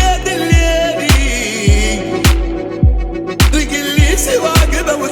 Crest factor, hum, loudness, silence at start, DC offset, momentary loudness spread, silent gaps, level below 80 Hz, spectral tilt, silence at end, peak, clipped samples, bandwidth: 12 dB; none; -13 LUFS; 0 s; under 0.1%; 4 LU; none; -16 dBFS; -4.5 dB/octave; 0 s; 0 dBFS; under 0.1%; 18.5 kHz